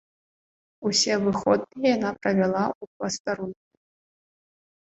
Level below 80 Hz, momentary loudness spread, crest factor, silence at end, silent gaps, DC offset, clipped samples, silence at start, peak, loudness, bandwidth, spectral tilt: -62 dBFS; 10 LU; 20 dB; 1.35 s; 2.75-2.81 s, 2.87-3.00 s, 3.20-3.25 s; under 0.1%; under 0.1%; 0.8 s; -8 dBFS; -25 LUFS; 8.2 kHz; -4 dB/octave